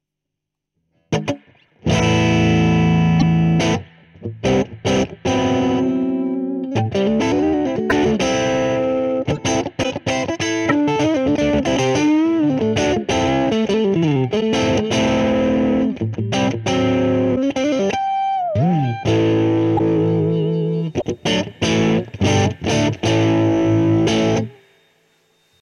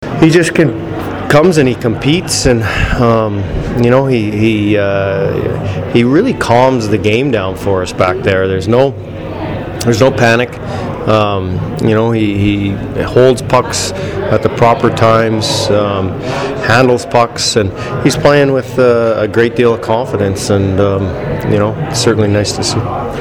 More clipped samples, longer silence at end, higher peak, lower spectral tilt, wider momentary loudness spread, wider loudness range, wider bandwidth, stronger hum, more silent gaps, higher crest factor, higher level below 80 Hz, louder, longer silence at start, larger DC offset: neither; first, 1.1 s vs 0 s; about the same, -2 dBFS vs 0 dBFS; about the same, -6 dB/octave vs -5.5 dB/octave; about the same, 6 LU vs 8 LU; about the same, 2 LU vs 2 LU; second, 11 kHz vs 17.5 kHz; neither; neither; about the same, 16 dB vs 12 dB; second, -42 dBFS vs -32 dBFS; second, -18 LUFS vs -12 LUFS; first, 1.1 s vs 0 s; neither